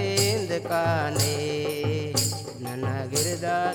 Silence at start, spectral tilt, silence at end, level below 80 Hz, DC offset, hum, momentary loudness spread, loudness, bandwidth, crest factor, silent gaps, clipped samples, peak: 0 s; -4 dB/octave; 0 s; -56 dBFS; under 0.1%; none; 6 LU; -26 LUFS; 19 kHz; 18 dB; none; under 0.1%; -8 dBFS